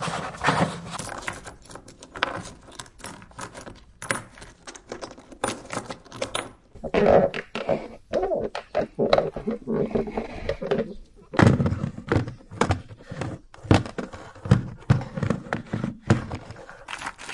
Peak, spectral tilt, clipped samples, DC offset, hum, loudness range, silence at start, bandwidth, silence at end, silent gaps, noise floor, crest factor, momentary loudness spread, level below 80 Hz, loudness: -2 dBFS; -6 dB/octave; under 0.1%; under 0.1%; none; 10 LU; 0 s; 11.5 kHz; 0 s; none; -45 dBFS; 26 dB; 19 LU; -46 dBFS; -26 LUFS